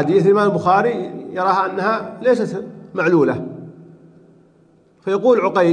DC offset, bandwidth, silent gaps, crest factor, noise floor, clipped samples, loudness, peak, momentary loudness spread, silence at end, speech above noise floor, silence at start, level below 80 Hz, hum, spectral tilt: under 0.1%; 9.8 kHz; none; 16 dB; -53 dBFS; under 0.1%; -17 LUFS; -2 dBFS; 14 LU; 0 s; 37 dB; 0 s; -64 dBFS; none; -7.5 dB/octave